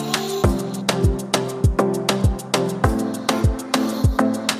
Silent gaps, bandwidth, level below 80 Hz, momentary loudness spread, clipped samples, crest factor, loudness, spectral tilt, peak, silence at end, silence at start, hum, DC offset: none; 16 kHz; -28 dBFS; 3 LU; under 0.1%; 20 dB; -21 LUFS; -5 dB/octave; 0 dBFS; 0 s; 0 s; none; under 0.1%